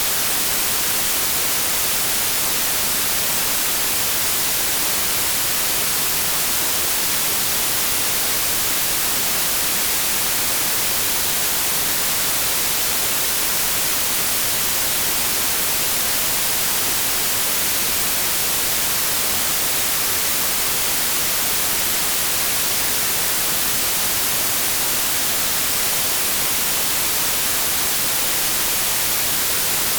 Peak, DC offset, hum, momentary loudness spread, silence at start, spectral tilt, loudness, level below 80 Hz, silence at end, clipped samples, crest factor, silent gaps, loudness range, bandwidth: -6 dBFS; under 0.1%; none; 0 LU; 0 s; 0 dB/octave; -16 LUFS; -44 dBFS; 0 s; under 0.1%; 14 dB; none; 0 LU; over 20 kHz